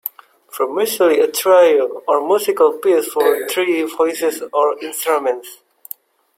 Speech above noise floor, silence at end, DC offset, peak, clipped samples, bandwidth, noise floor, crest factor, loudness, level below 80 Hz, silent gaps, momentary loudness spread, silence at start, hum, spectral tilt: 23 dB; 0.85 s; under 0.1%; -2 dBFS; under 0.1%; 16.5 kHz; -39 dBFS; 14 dB; -16 LUFS; -70 dBFS; none; 15 LU; 0.05 s; none; -2 dB/octave